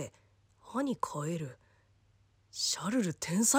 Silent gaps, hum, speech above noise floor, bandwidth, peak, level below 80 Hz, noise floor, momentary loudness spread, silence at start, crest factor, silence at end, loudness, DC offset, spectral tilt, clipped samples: none; none; 35 dB; 16.5 kHz; -14 dBFS; -72 dBFS; -68 dBFS; 14 LU; 0 s; 20 dB; 0 s; -34 LUFS; under 0.1%; -3.5 dB/octave; under 0.1%